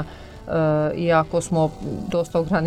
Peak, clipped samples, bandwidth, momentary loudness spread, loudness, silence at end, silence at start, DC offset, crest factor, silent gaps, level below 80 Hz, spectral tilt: -6 dBFS; under 0.1%; 12.5 kHz; 10 LU; -22 LUFS; 0 s; 0 s; under 0.1%; 16 dB; none; -44 dBFS; -6.5 dB/octave